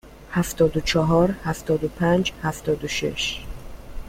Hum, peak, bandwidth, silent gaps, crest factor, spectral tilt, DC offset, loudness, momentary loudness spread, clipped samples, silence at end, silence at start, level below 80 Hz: none; -6 dBFS; 16.5 kHz; none; 18 dB; -5 dB/octave; under 0.1%; -23 LUFS; 11 LU; under 0.1%; 0 s; 0.05 s; -38 dBFS